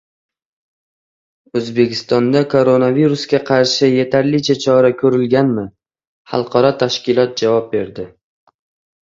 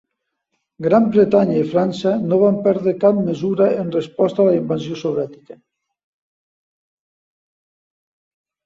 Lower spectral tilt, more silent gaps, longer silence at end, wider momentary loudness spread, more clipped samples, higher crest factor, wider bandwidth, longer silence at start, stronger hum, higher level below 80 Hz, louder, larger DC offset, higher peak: second, -6 dB/octave vs -8.5 dB/octave; first, 6.07-6.25 s vs none; second, 0.95 s vs 3.1 s; about the same, 10 LU vs 9 LU; neither; about the same, 16 dB vs 18 dB; about the same, 7.8 kHz vs 7.6 kHz; first, 1.55 s vs 0.8 s; neither; first, -56 dBFS vs -62 dBFS; about the same, -15 LUFS vs -17 LUFS; neither; about the same, 0 dBFS vs -2 dBFS